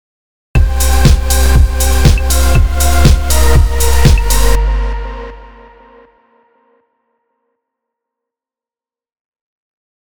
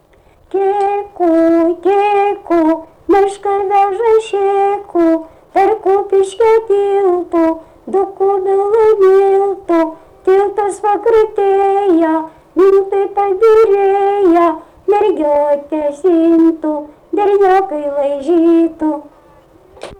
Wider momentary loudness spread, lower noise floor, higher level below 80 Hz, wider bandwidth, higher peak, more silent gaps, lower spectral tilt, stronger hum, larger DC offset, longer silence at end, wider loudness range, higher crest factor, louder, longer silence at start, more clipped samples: about the same, 9 LU vs 8 LU; first, under -90 dBFS vs -47 dBFS; first, -14 dBFS vs -50 dBFS; first, over 20 kHz vs 10.5 kHz; first, 0 dBFS vs -4 dBFS; first, 9.20-9.32 s vs none; about the same, -4.5 dB/octave vs -5.5 dB/octave; neither; neither; first, 0.5 s vs 0.05 s; first, 12 LU vs 2 LU; about the same, 12 dB vs 8 dB; about the same, -11 LUFS vs -13 LUFS; about the same, 0.55 s vs 0.55 s; first, 0.9% vs under 0.1%